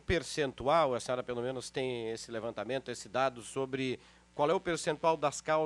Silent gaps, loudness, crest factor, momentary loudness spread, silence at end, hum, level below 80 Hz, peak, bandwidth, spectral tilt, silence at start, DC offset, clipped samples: none; -34 LUFS; 20 dB; 9 LU; 0 s; none; -56 dBFS; -14 dBFS; 13 kHz; -4.5 dB/octave; 0.1 s; under 0.1%; under 0.1%